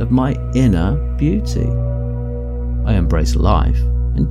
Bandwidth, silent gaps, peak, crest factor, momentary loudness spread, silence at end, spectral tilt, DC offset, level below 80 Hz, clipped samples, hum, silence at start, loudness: 9.4 kHz; none; -2 dBFS; 14 dB; 8 LU; 0 s; -8 dB/octave; under 0.1%; -18 dBFS; under 0.1%; 60 Hz at -20 dBFS; 0 s; -18 LUFS